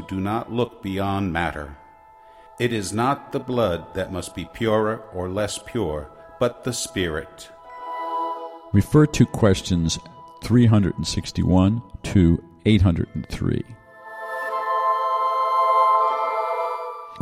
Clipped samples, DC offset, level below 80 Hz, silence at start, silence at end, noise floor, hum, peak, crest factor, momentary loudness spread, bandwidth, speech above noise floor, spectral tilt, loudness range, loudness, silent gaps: under 0.1%; under 0.1%; -40 dBFS; 0 s; 0 s; -49 dBFS; none; -4 dBFS; 18 dB; 15 LU; 15.5 kHz; 27 dB; -6 dB/octave; 6 LU; -22 LUFS; none